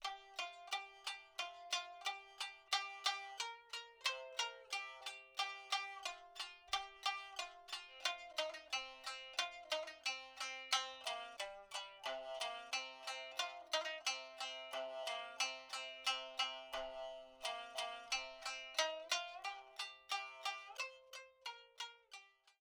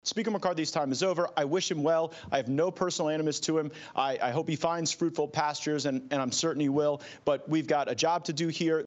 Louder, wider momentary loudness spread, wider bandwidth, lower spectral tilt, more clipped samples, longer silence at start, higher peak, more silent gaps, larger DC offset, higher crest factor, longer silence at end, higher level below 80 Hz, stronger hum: second, -44 LUFS vs -29 LUFS; first, 9 LU vs 4 LU; first, over 20 kHz vs 8.4 kHz; second, 2.5 dB/octave vs -4 dB/octave; neither; about the same, 0 s vs 0.05 s; second, -20 dBFS vs -12 dBFS; neither; neither; first, 26 dB vs 18 dB; first, 0.15 s vs 0 s; second, -80 dBFS vs -72 dBFS; neither